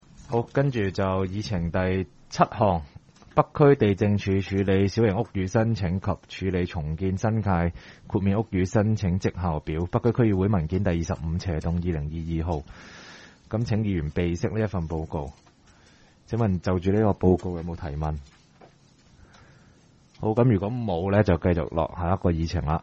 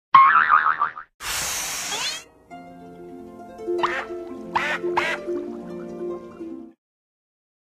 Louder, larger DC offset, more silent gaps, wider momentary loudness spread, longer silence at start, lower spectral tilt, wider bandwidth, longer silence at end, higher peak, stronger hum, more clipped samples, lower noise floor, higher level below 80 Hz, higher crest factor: second, -25 LUFS vs -22 LUFS; neither; second, none vs 1.14-1.19 s; second, 9 LU vs 25 LU; about the same, 0.2 s vs 0.15 s; first, -8 dB/octave vs -1.5 dB/octave; second, 7.6 kHz vs 15 kHz; second, 0 s vs 1.05 s; about the same, -4 dBFS vs -2 dBFS; neither; neither; first, -56 dBFS vs -43 dBFS; first, -42 dBFS vs -58 dBFS; about the same, 20 dB vs 24 dB